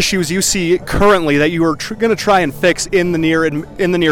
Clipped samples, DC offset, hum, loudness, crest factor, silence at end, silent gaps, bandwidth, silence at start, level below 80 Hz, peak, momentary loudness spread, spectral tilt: under 0.1%; under 0.1%; none; -14 LUFS; 10 dB; 0 s; none; 18 kHz; 0 s; -34 dBFS; -4 dBFS; 5 LU; -4 dB/octave